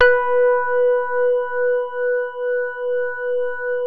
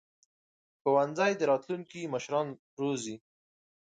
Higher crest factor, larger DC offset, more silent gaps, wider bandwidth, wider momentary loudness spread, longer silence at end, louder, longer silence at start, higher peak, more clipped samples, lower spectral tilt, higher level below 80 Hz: about the same, 14 dB vs 18 dB; neither; second, none vs 2.59-2.77 s; second, 4.7 kHz vs 9.4 kHz; second, 6 LU vs 12 LU; second, 0 s vs 0.8 s; first, -20 LUFS vs -31 LUFS; second, 0 s vs 0.85 s; first, -4 dBFS vs -14 dBFS; neither; second, -3.5 dB/octave vs -5 dB/octave; first, -56 dBFS vs -80 dBFS